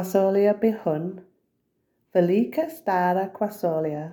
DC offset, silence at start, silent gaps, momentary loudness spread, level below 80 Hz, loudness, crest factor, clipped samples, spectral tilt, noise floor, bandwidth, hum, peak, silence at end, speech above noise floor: under 0.1%; 0 s; none; 8 LU; -72 dBFS; -24 LUFS; 16 dB; under 0.1%; -7.5 dB/octave; -73 dBFS; 19.5 kHz; none; -8 dBFS; 0 s; 50 dB